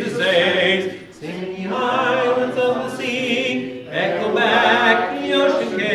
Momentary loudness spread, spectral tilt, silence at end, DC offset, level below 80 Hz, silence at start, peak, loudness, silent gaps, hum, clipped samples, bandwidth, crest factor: 12 LU; -4.5 dB/octave; 0 s; under 0.1%; -62 dBFS; 0 s; -2 dBFS; -18 LUFS; none; none; under 0.1%; 13 kHz; 16 dB